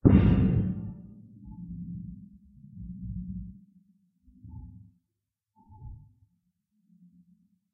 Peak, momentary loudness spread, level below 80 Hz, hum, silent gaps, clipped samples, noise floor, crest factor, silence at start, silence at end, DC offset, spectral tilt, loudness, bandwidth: -4 dBFS; 27 LU; -40 dBFS; none; none; under 0.1%; -85 dBFS; 28 dB; 0.05 s; 1.8 s; under 0.1%; -10 dB/octave; -29 LUFS; 4 kHz